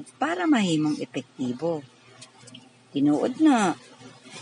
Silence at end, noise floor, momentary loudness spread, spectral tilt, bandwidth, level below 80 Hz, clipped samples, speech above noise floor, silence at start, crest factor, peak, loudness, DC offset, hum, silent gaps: 0 s; -50 dBFS; 14 LU; -5.5 dB/octave; 11 kHz; -76 dBFS; under 0.1%; 26 dB; 0 s; 16 dB; -10 dBFS; -25 LUFS; under 0.1%; none; none